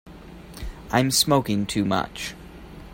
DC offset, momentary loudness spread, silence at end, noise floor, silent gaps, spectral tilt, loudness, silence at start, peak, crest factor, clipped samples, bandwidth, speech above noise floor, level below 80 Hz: under 0.1%; 24 LU; 0 s; -42 dBFS; none; -4 dB/octave; -23 LUFS; 0.05 s; -6 dBFS; 20 dB; under 0.1%; 16.5 kHz; 20 dB; -44 dBFS